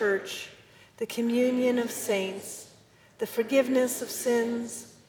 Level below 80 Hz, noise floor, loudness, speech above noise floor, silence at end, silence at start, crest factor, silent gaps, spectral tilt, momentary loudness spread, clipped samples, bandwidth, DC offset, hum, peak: -74 dBFS; -57 dBFS; -28 LUFS; 30 dB; 0.2 s; 0 s; 18 dB; none; -3.5 dB/octave; 14 LU; under 0.1%; over 20 kHz; under 0.1%; none; -12 dBFS